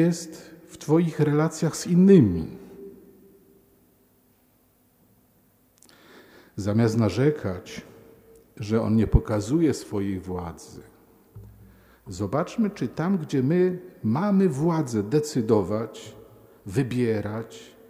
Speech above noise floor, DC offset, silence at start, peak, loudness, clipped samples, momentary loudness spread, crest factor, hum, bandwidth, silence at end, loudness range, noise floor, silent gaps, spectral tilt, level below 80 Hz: 39 dB; under 0.1%; 0 s; -4 dBFS; -24 LUFS; under 0.1%; 20 LU; 20 dB; none; 15.5 kHz; 0.25 s; 8 LU; -63 dBFS; none; -7.5 dB/octave; -42 dBFS